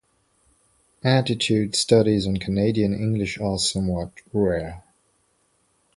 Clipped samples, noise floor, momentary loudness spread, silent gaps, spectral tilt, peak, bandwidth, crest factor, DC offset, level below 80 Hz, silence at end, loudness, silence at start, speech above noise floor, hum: under 0.1%; -66 dBFS; 10 LU; none; -5 dB/octave; -2 dBFS; 11.5 kHz; 20 dB; under 0.1%; -46 dBFS; 1.15 s; -22 LUFS; 1.05 s; 45 dB; none